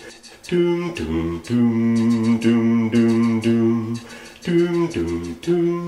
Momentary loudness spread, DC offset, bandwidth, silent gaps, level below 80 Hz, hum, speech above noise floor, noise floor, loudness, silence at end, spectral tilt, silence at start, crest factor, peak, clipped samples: 10 LU; under 0.1%; 11.5 kHz; none; -46 dBFS; none; 21 dB; -40 dBFS; -20 LUFS; 0 s; -7 dB/octave; 0 s; 12 dB; -6 dBFS; under 0.1%